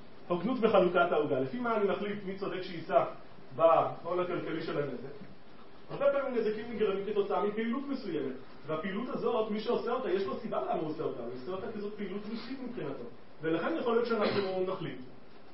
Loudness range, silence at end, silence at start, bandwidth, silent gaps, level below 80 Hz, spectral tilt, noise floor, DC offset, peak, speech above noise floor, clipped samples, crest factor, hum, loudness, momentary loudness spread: 5 LU; 0 s; 0 s; 5.8 kHz; none; -68 dBFS; -4.5 dB/octave; -55 dBFS; 0.6%; -12 dBFS; 23 dB; under 0.1%; 20 dB; none; -32 LUFS; 13 LU